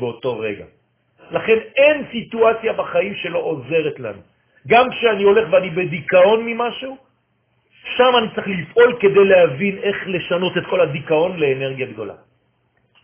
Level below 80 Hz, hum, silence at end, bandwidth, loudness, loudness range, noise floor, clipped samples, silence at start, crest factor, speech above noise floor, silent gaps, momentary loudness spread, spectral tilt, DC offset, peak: -56 dBFS; none; 0.9 s; 3.6 kHz; -17 LUFS; 3 LU; -64 dBFS; under 0.1%; 0 s; 18 dB; 47 dB; none; 13 LU; -9 dB/octave; under 0.1%; 0 dBFS